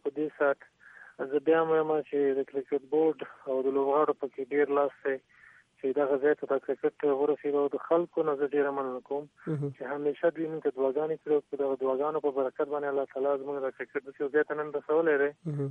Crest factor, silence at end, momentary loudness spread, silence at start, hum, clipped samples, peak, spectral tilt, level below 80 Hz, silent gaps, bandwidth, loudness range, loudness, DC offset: 16 dB; 0 s; 8 LU; 0.05 s; none; under 0.1%; -14 dBFS; -9 dB/octave; -82 dBFS; none; 3.8 kHz; 2 LU; -30 LUFS; under 0.1%